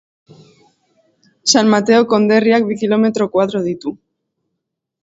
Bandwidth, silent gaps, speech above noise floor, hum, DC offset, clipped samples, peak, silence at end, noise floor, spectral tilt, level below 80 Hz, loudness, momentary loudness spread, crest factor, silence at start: 8 kHz; none; 63 dB; none; under 0.1%; under 0.1%; 0 dBFS; 1.1 s; -77 dBFS; -4 dB/octave; -60 dBFS; -14 LUFS; 9 LU; 16 dB; 1.45 s